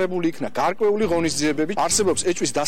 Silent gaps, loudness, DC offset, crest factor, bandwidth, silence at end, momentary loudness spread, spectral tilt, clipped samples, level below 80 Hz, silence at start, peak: none; -21 LUFS; 2%; 12 dB; 16.5 kHz; 0 s; 5 LU; -3.5 dB/octave; under 0.1%; -52 dBFS; 0 s; -10 dBFS